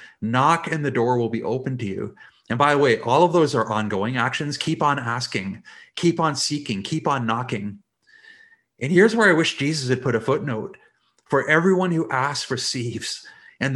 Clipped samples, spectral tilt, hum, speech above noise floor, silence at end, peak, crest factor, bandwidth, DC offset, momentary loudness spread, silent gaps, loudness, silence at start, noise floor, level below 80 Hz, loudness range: under 0.1%; -5 dB/octave; none; 31 dB; 0 s; -2 dBFS; 20 dB; 12.5 kHz; under 0.1%; 13 LU; none; -21 LUFS; 0 s; -52 dBFS; -64 dBFS; 4 LU